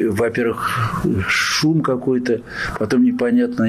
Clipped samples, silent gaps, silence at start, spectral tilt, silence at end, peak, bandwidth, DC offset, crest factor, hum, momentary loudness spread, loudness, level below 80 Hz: under 0.1%; none; 0 s; -5 dB/octave; 0 s; -8 dBFS; 15 kHz; under 0.1%; 10 dB; none; 6 LU; -18 LUFS; -44 dBFS